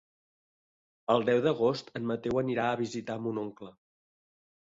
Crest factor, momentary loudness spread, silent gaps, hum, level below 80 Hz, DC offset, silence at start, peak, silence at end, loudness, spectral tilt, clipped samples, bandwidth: 22 dB; 15 LU; none; none; -66 dBFS; under 0.1%; 1.1 s; -10 dBFS; 1 s; -30 LUFS; -6.5 dB/octave; under 0.1%; 7.8 kHz